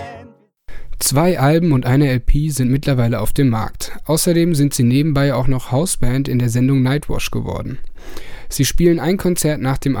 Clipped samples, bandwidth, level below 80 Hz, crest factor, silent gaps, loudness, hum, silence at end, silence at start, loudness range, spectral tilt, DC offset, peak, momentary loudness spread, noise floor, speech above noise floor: under 0.1%; 19 kHz; -26 dBFS; 14 dB; none; -17 LUFS; none; 0 s; 0 s; 3 LU; -5.5 dB/octave; under 0.1%; -2 dBFS; 12 LU; -43 dBFS; 28 dB